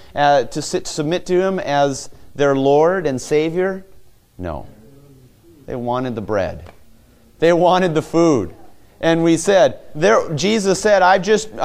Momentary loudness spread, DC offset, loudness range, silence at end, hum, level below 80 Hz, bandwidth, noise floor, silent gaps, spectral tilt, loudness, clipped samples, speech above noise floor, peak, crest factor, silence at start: 16 LU; under 0.1%; 9 LU; 0 s; none; -46 dBFS; 15 kHz; -48 dBFS; none; -5 dB/octave; -17 LUFS; under 0.1%; 32 dB; -2 dBFS; 16 dB; 0 s